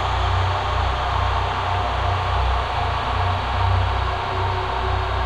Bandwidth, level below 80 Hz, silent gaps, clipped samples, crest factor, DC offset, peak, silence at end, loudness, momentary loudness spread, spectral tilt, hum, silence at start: 9.2 kHz; -26 dBFS; none; under 0.1%; 14 dB; under 0.1%; -8 dBFS; 0 s; -22 LUFS; 2 LU; -5.5 dB/octave; none; 0 s